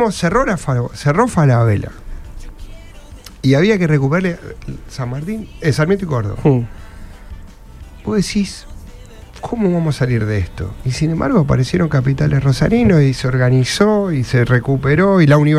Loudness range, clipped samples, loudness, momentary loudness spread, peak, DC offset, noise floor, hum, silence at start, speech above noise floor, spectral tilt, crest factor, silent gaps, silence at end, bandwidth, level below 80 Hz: 6 LU; under 0.1%; -15 LUFS; 13 LU; 0 dBFS; under 0.1%; -36 dBFS; none; 0 s; 21 dB; -7 dB/octave; 14 dB; none; 0 s; 12.5 kHz; -34 dBFS